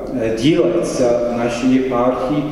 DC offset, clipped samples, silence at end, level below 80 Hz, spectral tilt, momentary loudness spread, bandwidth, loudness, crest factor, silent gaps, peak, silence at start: under 0.1%; under 0.1%; 0 s; -40 dBFS; -6 dB/octave; 4 LU; 12 kHz; -16 LUFS; 14 dB; none; -2 dBFS; 0 s